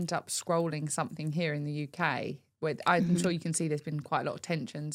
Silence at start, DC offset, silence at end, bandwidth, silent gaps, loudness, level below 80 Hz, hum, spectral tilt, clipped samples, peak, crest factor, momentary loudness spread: 0 s; under 0.1%; 0 s; 15.5 kHz; none; -32 LUFS; -72 dBFS; none; -5 dB/octave; under 0.1%; -10 dBFS; 22 dB; 8 LU